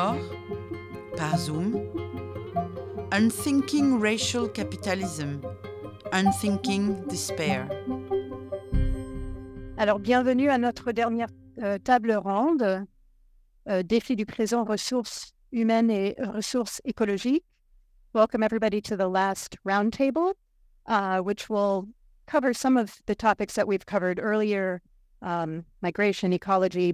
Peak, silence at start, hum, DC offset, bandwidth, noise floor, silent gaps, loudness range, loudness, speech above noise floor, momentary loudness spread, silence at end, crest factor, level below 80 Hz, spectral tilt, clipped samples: -8 dBFS; 0 s; none; under 0.1%; 16 kHz; -60 dBFS; none; 2 LU; -27 LUFS; 34 dB; 13 LU; 0 s; 18 dB; -44 dBFS; -5 dB/octave; under 0.1%